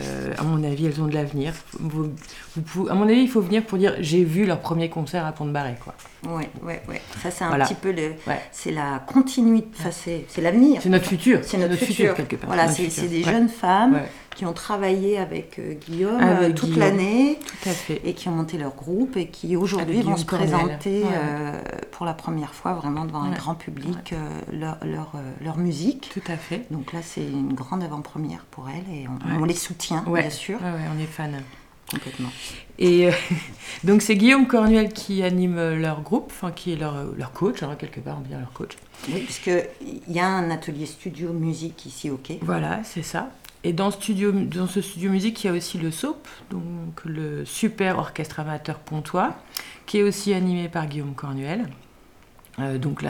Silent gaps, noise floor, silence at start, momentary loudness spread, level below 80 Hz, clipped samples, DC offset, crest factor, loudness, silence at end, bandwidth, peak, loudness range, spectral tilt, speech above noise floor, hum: none; -51 dBFS; 0 s; 15 LU; -50 dBFS; under 0.1%; under 0.1%; 22 dB; -24 LUFS; 0 s; 19 kHz; -2 dBFS; 9 LU; -6 dB/octave; 28 dB; none